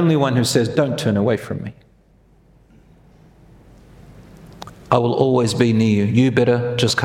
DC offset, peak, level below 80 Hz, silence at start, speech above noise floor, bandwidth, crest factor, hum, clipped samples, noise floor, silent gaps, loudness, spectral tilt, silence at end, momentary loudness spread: under 0.1%; 0 dBFS; -50 dBFS; 0 s; 36 dB; 16.5 kHz; 18 dB; none; under 0.1%; -53 dBFS; none; -17 LUFS; -6 dB/octave; 0 s; 14 LU